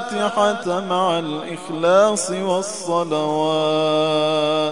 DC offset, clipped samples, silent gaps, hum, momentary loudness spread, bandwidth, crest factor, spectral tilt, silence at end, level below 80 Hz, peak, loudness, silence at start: 0.4%; under 0.1%; none; none; 7 LU; 11 kHz; 18 dB; -4 dB/octave; 0 s; -68 dBFS; -2 dBFS; -19 LUFS; 0 s